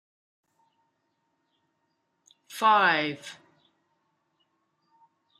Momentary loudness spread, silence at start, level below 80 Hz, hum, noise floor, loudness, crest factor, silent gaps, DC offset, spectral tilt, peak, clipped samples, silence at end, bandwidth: 23 LU; 2.5 s; -86 dBFS; none; -76 dBFS; -23 LUFS; 22 dB; none; under 0.1%; -3.5 dB/octave; -10 dBFS; under 0.1%; 2.05 s; 14 kHz